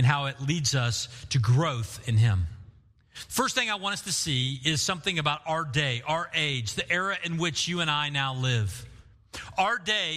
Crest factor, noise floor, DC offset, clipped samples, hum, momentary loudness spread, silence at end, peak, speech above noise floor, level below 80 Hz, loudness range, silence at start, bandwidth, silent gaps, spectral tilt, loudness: 20 dB; -56 dBFS; under 0.1%; under 0.1%; none; 7 LU; 0 s; -8 dBFS; 28 dB; -52 dBFS; 1 LU; 0 s; 15 kHz; none; -3.5 dB/octave; -27 LUFS